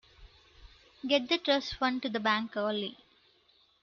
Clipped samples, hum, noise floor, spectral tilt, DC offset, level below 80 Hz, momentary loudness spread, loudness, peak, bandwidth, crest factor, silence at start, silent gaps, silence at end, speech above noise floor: under 0.1%; none; -67 dBFS; -4 dB/octave; under 0.1%; -62 dBFS; 8 LU; -30 LUFS; -14 dBFS; 7.2 kHz; 20 dB; 0.2 s; none; 0.9 s; 36 dB